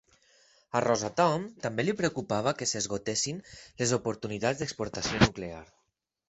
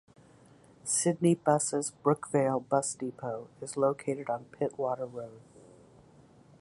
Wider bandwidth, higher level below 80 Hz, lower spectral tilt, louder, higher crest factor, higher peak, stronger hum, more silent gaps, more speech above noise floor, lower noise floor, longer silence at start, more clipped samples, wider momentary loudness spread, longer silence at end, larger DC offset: second, 8.4 kHz vs 11.5 kHz; first, -54 dBFS vs -74 dBFS; about the same, -4 dB/octave vs -5 dB/octave; about the same, -29 LUFS vs -31 LUFS; first, 26 dB vs 20 dB; first, -6 dBFS vs -12 dBFS; neither; neither; first, 48 dB vs 28 dB; first, -78 dBFS vs -58 dBFS; about the same, 0.75 s vs 0.85 s; neither; second, 8 LU vs 13 LU; second, 0.65 s vs 1.2 s; neither